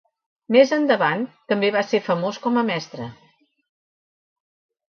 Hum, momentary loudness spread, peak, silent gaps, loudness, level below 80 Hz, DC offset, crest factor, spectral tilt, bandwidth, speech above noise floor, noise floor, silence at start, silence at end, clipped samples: none; 12 LU; -2 dBFS; none; -20 LUFS; -70 dBFS; under 0.1%; 20 dB; -5.5 dB/octave; 6.8 kHz; over 70 dB; under -90 dBFS; 0.5 s; 1.75 s; under 0.1%